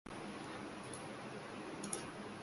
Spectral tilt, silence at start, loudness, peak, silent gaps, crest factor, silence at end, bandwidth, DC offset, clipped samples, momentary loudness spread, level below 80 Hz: -3.5 dB/octave; 0.05 s; -47 LUFS; -24 dBFS; none; 22 dB; 0 s; 11.5 kHz; under 0.1%; under 0.1%; 4 LU; -72 dBFS